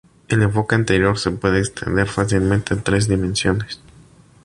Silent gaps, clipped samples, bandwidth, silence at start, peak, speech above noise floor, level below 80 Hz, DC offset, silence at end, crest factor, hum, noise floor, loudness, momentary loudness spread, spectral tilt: none; under 0.1%; 11.5 kHz; 0.3 s; -2 dBFS; 30 dB; -36 dBFS; under 0.1%; 0.7 s; 16 dB; none; -48 dBFS; -19 LUFS; 5 LU; -5.5 dB/octave